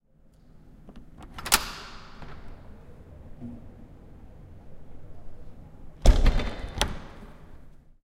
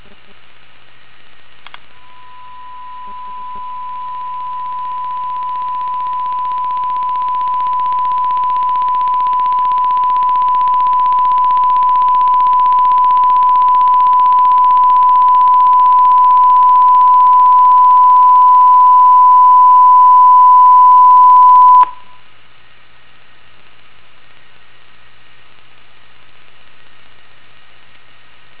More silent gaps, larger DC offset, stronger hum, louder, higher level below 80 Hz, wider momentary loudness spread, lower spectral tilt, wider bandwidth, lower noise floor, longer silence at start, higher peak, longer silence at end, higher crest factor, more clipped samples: neither; second, under 0.1% vs 3%; neither; second, -27 LUFS vs -9 LUFS; first, -30 dBFS vs -58 dBFS; first, 27 LU vs 16 LU; second, -3.5 dB/octave vs -6 dB/octave; first, 16 kHz vs 4 kHz; first, -56 dBFS vs -46 dBFS; second, 0.65 s vs 2.6 s; about the same, -2 dBFS vs 0 dBFS; second, 0.25 s vs 6.65 s; first, 28 dB vs 10 dB; neither